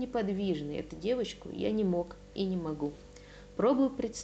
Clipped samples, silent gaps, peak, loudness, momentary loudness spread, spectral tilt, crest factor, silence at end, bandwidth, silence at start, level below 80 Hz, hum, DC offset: under 0.1%; none; -18 dBFS; -33 LUFS; 13 LU; -6.5 dB/octave; 16 dB; 0 s; 8.8 kHz; 0 s; -56 dBFS; none; under 0.1%